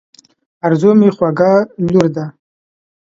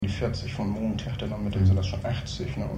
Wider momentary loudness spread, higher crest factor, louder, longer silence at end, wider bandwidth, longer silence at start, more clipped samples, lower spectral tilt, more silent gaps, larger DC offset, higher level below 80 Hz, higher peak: first, 11 LU vs 8 LU; about the same, 14 dB vs 16 dB; first, -13 LUFS vs -28 LUFS; first, 0.75 s vs 0 s; second, 7.6 kHz vs 8.4 kHz; first, 0.65 s vs 0 s; neither; first, -8.5 dB/octave vs -7 dB/octave; neither; neither; second, -52 dBFS vs -40 dBFS; first, 0 dBFS vs -12 dBFS